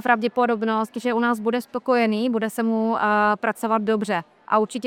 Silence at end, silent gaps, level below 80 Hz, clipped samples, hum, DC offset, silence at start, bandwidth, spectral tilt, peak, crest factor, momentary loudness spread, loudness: 0 s; none; -66 dBFS; under 0.1%; none; under 0.1%; 0.05 s; 16 kHz; -5.5 dB/octave; -4 dBFS; 18 dB; 5 LU; -22 LUFS